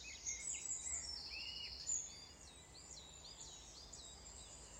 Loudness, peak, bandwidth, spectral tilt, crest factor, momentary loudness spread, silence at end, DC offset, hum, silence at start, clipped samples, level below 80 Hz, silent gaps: -46 LUFS; -30 dBFS; 16 kHz; 0 dB/octave; 20 dB; 13 LU; 0 s; under 0.1%; none; 0 s; under 0.1%; -64 dBFS; none